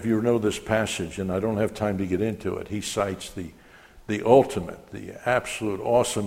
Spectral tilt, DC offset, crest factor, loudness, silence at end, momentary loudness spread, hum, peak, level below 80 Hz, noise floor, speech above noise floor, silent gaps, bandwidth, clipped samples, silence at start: -5 dB/octave; under 0.1%; 22 dB; -25 LUFS; 0 s; 17 LU; none; -2 dBFS; -52 dBFS; -50 dBFS; 25 dB; none; 16 kHz; under 0.1%; 0 s